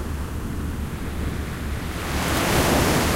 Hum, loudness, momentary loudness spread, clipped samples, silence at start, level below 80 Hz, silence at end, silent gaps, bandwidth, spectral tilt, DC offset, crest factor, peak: none; -24 LUFS; 11 LU; under 0.1%; 0 s; -30 dBFS; 0 s; none; 16 kHz; -4.5 dB/octave; under 0.1%; 18 dB; -6 dBFS